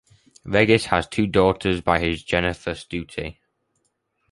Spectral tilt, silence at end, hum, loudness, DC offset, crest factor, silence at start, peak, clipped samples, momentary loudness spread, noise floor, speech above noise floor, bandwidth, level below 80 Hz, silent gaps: -5.5 dB/octave; 1 s; none; -21 LUFS; under 0.1%; 20 dB; 0.45 s; -2 dBFS; under 0.1%; 13 LU; -72 dBFS; 50 dB; 11.5 kHz; -42 dBFS; none